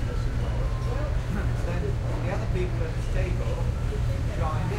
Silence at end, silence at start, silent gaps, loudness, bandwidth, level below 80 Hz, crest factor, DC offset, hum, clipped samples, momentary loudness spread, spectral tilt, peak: 0 s; 0 s; none; -29 LUFS; 12 kHz; -28 dBFS; 12 dB; under 0.1%; none; under 0.1%; 1 LU; -7 dB/octave; -14 dBFS